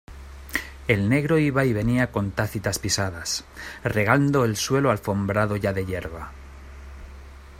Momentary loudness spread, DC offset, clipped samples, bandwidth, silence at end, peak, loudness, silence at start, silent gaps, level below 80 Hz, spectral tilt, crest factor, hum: 22 LU; under 0.1%; under 0.1%; 16 kHz; 0 s; -4 dBFS; -23 LUFS; 0.1 s; none; -44 dBFS; -5 dB/octave; 20 dB; none